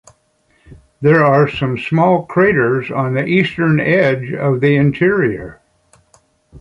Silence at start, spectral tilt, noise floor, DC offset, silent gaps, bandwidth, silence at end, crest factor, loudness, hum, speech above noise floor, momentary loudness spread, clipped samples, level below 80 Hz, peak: 0.7 s; -8.5 dB/octave; -58 dBFS; under 0.1%; none; 7.4 kHz; 0 s; 14 dB; -14 LUFS; none; 45 dB; 6 LU; under 0.1%; -48 dBFS; -2 dBFS